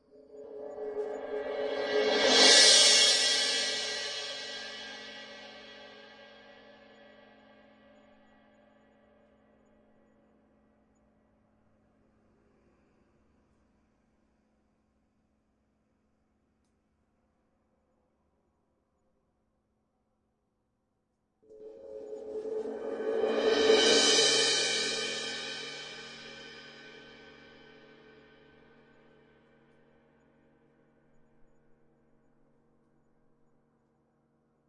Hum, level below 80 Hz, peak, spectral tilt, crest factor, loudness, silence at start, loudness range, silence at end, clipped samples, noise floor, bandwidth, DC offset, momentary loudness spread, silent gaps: none; -74 dBFS; -6 dBFS; 0.5 dB/octave; 26 dB; -25 LUFS; 0.35 s; 24 LU; 7.6 s; under 0.1%; -79 dBFS; 11.5 kHz; under 0.1%; 28 LU; none